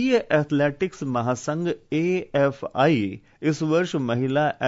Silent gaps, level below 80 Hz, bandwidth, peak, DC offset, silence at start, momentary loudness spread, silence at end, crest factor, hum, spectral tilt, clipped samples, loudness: none; -60 dBFS; 7.8 kHz; -8 dBFS; under 0.1%; 0 s; 6 LU; 0 s; 16 dB; none; -6.5 dB/octave; under 0.1%; -23 LUFS